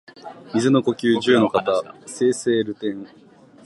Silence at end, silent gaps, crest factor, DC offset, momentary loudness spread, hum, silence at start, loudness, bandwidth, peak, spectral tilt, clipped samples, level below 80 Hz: 0.6 s; none; 18 dB; under 0.1%; 18 LU; none; 0.25 s; -20 LUFS; 11.5 kHz; -4 dBFS; -5 dB/octave; under 0.1%; -64 dBFS